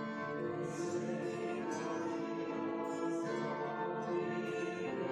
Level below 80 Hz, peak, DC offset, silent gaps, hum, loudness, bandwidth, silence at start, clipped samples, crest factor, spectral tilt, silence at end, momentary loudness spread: -80 dBFS; -26 dBFS; under 0.1%; none; none; -39 LUFS; 11.5 kHz; 0 s; under 0.1%; 12 dB; -6 dB/octave; 0 s; 2 LU